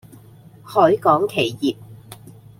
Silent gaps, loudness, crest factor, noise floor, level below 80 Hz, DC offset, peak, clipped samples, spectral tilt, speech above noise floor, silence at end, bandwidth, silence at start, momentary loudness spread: none; -18 LUFS; 20 dB; -45 dBFS; -60 dBFS; under 0.1%; -2 dBFS; under 0.1%; -6 dB/octave; 28 dB; 0.45 s; 16.5 kHz; 0.65 s; 10 LU